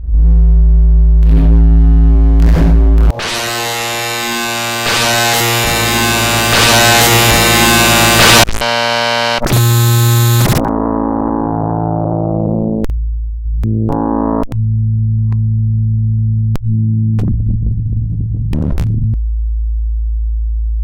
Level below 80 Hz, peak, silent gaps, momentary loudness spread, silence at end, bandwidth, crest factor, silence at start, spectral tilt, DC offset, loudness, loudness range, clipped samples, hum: -14 dBFS; 0 dBFS; none; 11 LU; 0 s; 16.5 kHz; 10 dB; 0 s; -4 dB/octave; under 0.1%; -12 LUFS; 9 LU; 0.1%; none